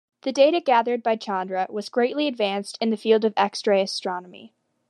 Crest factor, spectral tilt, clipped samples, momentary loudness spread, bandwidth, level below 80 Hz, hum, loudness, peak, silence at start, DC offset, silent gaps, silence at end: 18 dB; -4.5 dB/octave; under 0.1%; 8 LU; 11.5 kHz; -88 dBFS; none; -23 LUFS; -6 dBFS; 0.25 s; under 0.1%; none; 0.45 s